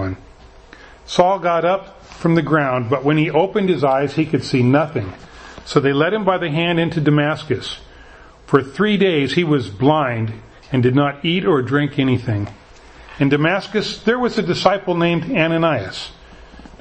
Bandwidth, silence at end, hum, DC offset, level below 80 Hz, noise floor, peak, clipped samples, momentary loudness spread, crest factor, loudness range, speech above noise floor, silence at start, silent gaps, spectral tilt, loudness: 8.8 kHz; 0.15 s; none; under 0.1%; -46 dBFS; -43 dBFS; 0 dBFS; under 0.1%; 10 LU; 18 dB; 2 LU; 26 dB; 0 s; none; -7 dB/octave; -18 LUFS